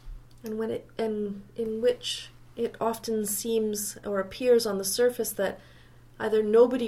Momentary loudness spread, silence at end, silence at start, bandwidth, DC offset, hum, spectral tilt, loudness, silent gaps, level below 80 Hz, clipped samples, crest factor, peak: 11 LU; 0 s; 0.05 s; 16.5 kHz; under 0.1%; none; -3.5 dB/octave; -28 LUFS; none; -54 dBFS; under 0.1%; 20 dB; -8 dBFS